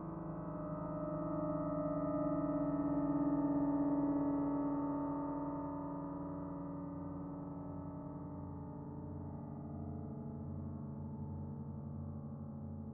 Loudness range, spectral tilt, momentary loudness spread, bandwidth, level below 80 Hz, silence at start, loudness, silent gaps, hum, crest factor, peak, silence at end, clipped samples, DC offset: 10 LU; -8.5 dB/octave; 12 LU; 2.2 kHz; -60 dBFS; 0 s; -41 LUFS; none; none; 14 dB; -26 dBFS; 0 s; under 0.1%; under 0.1%